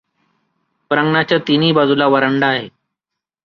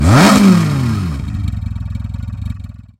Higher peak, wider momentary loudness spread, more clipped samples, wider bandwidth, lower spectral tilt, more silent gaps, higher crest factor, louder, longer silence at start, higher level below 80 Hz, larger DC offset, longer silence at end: about the same, -2 dBFS vs 0 dBFS; second, 6 LU vs 17 LU; neither; second, 6.6 kHz vs 17 kHz; first, -7.5 dB/octave vs -6 dB/octave; neither; about the same, 16 dB vs 14 dB; about the same, -14 LUFS vs -13 LUFS; first, 0.9 s vs 0 s; second, -58 dBFS vs -26 dBFS; neither; first, 0.75 s vs 0.2 s